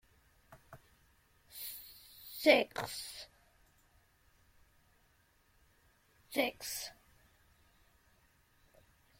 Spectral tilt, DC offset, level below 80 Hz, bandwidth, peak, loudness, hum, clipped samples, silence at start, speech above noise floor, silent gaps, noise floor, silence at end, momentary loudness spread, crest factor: -2.5 dB/octave; under 0.1%; -72 dBFS; 16.5 kHz; -12 dBFS; -35 LUFS; none; under 0.1%; 0.5 s; 38 dB; none; -71 dBFS; 2.25 s; 25 LU; 28 dB